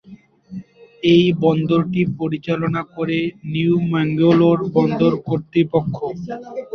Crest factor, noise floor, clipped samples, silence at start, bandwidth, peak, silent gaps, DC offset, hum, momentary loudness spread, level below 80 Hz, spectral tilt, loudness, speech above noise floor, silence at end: 16 dB; -44 dBFS; under 0.1%; 0.1 s; 6.4 kHz; -2 dBFS; none; under 0.1%; none; 15 LU; -54 dBFS; -8.5 dB/octave; -18 LUFS; 27 dB; 0 s